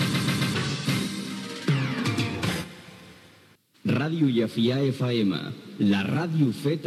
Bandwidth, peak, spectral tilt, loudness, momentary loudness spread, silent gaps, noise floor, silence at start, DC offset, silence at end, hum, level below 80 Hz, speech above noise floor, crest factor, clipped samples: 14.5 kHz; -12 dBFS; -6 dB/octave; -26 LUFS; 9 LU; none; -57 dBFS; 0 s; under 0.1%; 0 s; none; -62 dBFS; 33 dB; 14 dB; under 0.1%